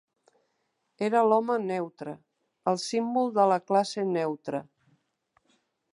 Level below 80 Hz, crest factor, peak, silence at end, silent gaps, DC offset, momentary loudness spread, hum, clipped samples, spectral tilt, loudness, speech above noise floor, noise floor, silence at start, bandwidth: -82 dBFS; 20 dB; -10 dBFS; 1.3 s; none; under 0.1%; 14 LU; none; under 0.1%; -5.5 dB/octave; -27 LUFS; 50 dB; -77 dBFS; 1 s; 11.5 kHz